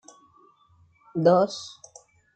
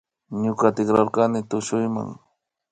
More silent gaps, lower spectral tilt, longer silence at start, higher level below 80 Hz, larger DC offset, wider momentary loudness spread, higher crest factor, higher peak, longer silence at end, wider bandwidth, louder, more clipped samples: neither; about the same, -6 dB/octave vs -6.5 dB/octave; first, 1.15 s vs 0.3 s; second, -76 dBFS vs -60 dBFS; neither; first, 22 LU vs 11 LU; about the same, 20 dB vs 20 dB; about the same, -6 dBFS vs -4 dBFS; first, 0.7 s vs 0.55 s; about the same, 9 kHz vs 9.4 kHz; about the same, -23 LUFS vs -22 LUFS; neither